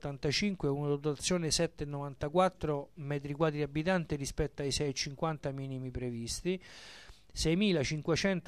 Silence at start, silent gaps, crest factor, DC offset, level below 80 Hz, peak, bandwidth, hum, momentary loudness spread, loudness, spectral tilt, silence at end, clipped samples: 0.05 s; none; 18 dB; under 0.1%; -50 dBFS; -16 dBFS; 14 kHz; none; 10 LU; -34 LUFS; -4.5 dB/octave; 0.05 s; under 0.1%